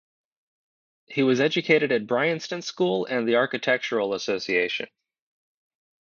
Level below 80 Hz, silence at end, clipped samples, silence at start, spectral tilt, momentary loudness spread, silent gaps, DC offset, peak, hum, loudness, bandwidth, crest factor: -74 dBFS; 1.15 s; under 0.1%; 1.1 s; -5 dB/octave; 8 LU; none; under 0.1%; -6 dBFS; none; -24 LUFS; 7.2 kHz; 18 dB